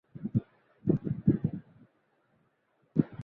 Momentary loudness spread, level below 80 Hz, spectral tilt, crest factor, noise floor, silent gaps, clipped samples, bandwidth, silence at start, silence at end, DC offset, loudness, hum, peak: 7 LU; -56 dBFS; -13 dB/octave; 24 dB; -73 dBFS; none; under 0.1%; 3.8 kHz; 0.15 s; 0 s; under 0.1%; -32 LUFS; none; -10 dBFS